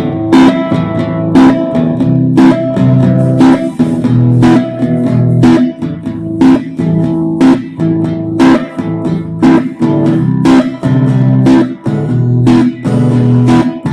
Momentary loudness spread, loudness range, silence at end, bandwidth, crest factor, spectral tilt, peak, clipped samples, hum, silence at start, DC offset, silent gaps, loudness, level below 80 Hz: 7 LU; 2 LU; 0 s; 10 kHz; 8 dB; -8.5 dB/octave; 0 dBFS; 0.6%; none; 0 s; under 0.1%; none; -9 LUFS; -38 dBFS